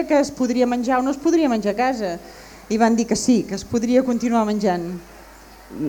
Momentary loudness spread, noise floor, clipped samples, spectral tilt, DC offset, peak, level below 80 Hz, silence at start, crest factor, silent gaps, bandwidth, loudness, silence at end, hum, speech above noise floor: 10 LU; -43 dBFS; under 0.1%; -5 dB/octave; under 0.1%; -4 dBFS; -50 dBFS; 0 s; 16 dB; none; 20 kHz; -20 LUFS; 0 s; none; 24 dB